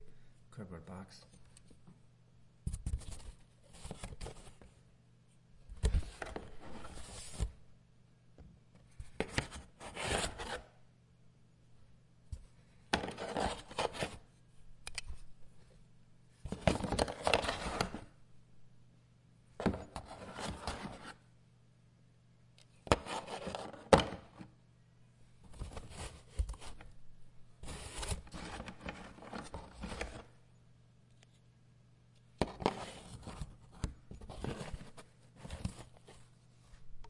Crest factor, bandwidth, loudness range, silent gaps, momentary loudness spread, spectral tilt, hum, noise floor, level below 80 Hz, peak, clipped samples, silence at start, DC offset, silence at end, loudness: 38 dB; 11.5 kHz; 13 LU; none; 24 LU; -4.5 dB/octave; none; -65 dBFS; -50 dBFS; -4 dBFS; under 0.1%; 0 s; under 0.1%; 0 s; -40 LUFS